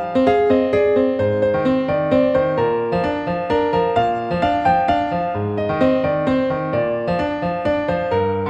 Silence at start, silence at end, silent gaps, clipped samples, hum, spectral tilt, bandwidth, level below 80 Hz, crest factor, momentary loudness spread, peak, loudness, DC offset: 0 s; 0 s; none; under 0.1%; none; -8 dB/octave; 8.2 kHz; -44 dBFS; 14 dB; 5 LU; -2 dBFS; -18 LUFS; under 0.1%